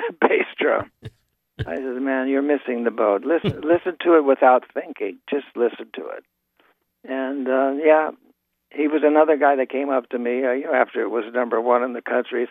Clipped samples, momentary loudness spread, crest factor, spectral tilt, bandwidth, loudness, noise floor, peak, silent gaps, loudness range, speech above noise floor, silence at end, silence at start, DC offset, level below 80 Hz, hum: under 0.1%; 14 LU; 20 dB; -8.5 dB/octave; 4.2 kHz; -21 LUFS; -63 dBFS; 0 dBFS; none; 4 LU; 43 dB; 0 s; 0 s; under 0.1%; -58 dBFS; none